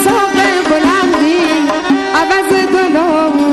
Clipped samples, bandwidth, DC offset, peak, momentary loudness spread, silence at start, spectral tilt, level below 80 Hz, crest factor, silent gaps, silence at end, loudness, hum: under 0.1%; 12.5 kHz; under 0.1%; -2 dBFS; 2 LU; 0 s; -3.5 dB/octave; -44 dBFS; 10 dB; none; 0 s; -11 LUFS; none